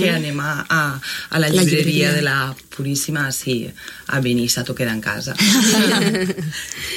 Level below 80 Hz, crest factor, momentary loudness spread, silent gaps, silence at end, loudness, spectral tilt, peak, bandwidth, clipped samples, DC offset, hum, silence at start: -52 dBFS; 16 dB; 12 LU; none; 0 s; -18 LUFS; -4 dB/octave; -2 dBFS; 16.5 kHz; under 0.1%; under 0.1%; none; 0 s